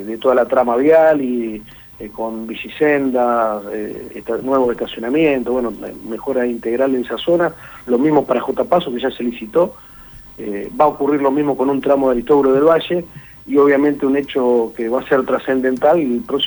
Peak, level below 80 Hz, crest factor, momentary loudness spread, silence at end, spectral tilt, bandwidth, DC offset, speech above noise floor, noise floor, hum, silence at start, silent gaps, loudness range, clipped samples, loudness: -2 dBFS; -48 dBFS; 14 dB; 13 LU; 0 s; -6.5 dB/octave; over 20 kHz; under 0.1%; 23 dB; -39 dBFS; none; 0 s; none; 4 LU; under 0.1%; -16 LUFS